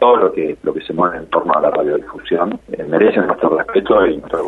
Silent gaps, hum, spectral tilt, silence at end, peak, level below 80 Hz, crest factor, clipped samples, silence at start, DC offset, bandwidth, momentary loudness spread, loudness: none; none; -7.5 dB/octave; 0 s; 0 dBFS; -48 dBFS; 14 dB; under 0.1%; 0 s; under 0.1%; 4.3 kHz; 8 LU; -16 LUFS